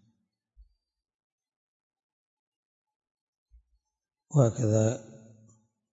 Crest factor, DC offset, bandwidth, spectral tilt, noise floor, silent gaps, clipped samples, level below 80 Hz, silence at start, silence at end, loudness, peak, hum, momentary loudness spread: 24 dB; under 0.1%; 7.8 kHz; -7.5 dB/octave; -89 dBFS; none; under 0.1%; -68 dBFS; 4.3 s; 0.9 s; -27 LUFS; -10 dBFS; none; 6 LU